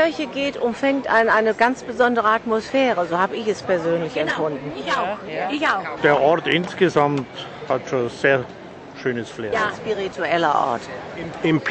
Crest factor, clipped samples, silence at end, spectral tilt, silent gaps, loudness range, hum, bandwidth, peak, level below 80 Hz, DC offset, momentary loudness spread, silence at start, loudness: 18 dB; under 0.1%; 0 s; -5.5 dB/octave; none; 4 LU; none; 9 kHz; -4 dBFS; -56 dBFS; under 0.1%; 10 LU; 0 s; -21 LUFS